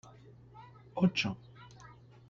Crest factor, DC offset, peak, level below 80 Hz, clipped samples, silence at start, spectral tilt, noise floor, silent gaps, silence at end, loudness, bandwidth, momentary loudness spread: 20 dB; under 0.1%; -16 dBFS; -68 dBFS; under 0.1%; 0.05 s; -6 dB/octave; -56 dBFS; none; 0.35 s; -33 LUFS; 7.6 kHz; 25 LU